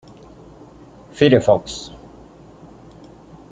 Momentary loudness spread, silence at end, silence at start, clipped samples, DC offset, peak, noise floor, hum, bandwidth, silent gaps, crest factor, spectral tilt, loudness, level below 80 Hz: 26 LU; 1.65 s; 1.15 s; under 0.1%; under 0.1%; -2 dBFS; -43 dBFS; none; 9.4 kHz; none; 20 dB; -6 dB/octave; -16 LUFS; -50 dBFS